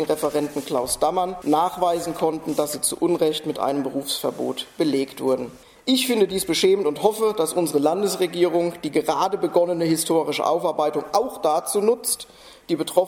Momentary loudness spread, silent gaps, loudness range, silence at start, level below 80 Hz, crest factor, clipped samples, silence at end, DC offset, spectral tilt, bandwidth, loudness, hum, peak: 5 LU; none; 3 LU; 0 s; -58 dBFS; 18 dB; under 0.1%; 0 s; under 0.1%; -4 dB/octave; 17 kHz; -22 LUFS; none; -4 dBFS